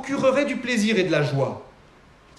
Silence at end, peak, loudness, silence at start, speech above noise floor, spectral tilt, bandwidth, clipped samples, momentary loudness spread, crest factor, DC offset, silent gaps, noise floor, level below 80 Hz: 0.7 s; -8 dBFS; -22 LUFS; 0 s; 30 dB; -5.5 dB/octave; 12.5 kHz; under 0.1%; 7 LU; 14 dB; under 0.1%; none; -52 dBFS; -58 dBFS